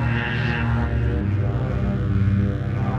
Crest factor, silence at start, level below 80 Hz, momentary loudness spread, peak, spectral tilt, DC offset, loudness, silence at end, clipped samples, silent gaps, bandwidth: 12 dB; 0 s; -30 dBFS; 3 LU; -8 dBFS; -8.5 dB/octave; under 0.1%; -22 LUFS; 0 s; under 0.1%; none; 6.2 kHz